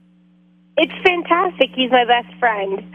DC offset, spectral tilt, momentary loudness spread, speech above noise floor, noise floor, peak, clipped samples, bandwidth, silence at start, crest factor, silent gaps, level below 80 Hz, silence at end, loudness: under 0.1%; -5.5 dB/octave; 5 LU; 35 dB; -53 dBFS; 0 dBFS; under 0.1%; 8 kHz; 0.75 s; 18 dB; none; -58 dBFS; 0 s; -17 LUFS